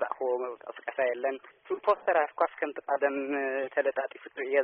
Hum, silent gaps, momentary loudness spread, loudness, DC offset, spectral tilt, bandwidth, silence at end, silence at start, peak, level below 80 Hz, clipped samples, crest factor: none; none; 11 LU; -30 LUFS; under 0.1%; 4.5 dB/octave; 3.7 kHz; 0 s; 0 s; -12 dBFS; -78 dBFS; under 0.1%; 18 dB